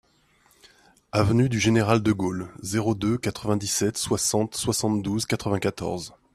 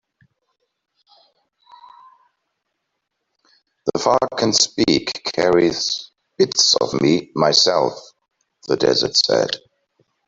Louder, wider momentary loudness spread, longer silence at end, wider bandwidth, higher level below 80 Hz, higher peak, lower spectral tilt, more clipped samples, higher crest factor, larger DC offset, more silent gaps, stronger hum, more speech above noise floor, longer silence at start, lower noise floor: second, -24 LUFS vs -17 LUFS; second, 8 LU vs 11 LU; second, 0.25 s vs 0.7 s; first, 15 kHz vs 8 kHz; first, -52 dBFS vs -58 dBFS; second, -4 dBFS vs 0 dBFS; first, -5 dB/octave vs -3 dB/octave; neither; about the same, 20 dB vs 20 dB; neither; neither; neither; second, 38 dB vs 59 dB; second, 1.15 s vs 3.85 s; second, -62 dBFS vs -76 dBFS